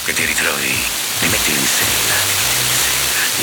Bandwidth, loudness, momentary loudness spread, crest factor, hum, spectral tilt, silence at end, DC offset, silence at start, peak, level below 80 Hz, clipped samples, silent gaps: over 20 kHz; -14 LUFS; 3 LU; 16 dB; none; -0.5 dB/octave; 0 s; under 0.1%; 0 s; -2 dBFS; -40 dBFS; under 0.1%; none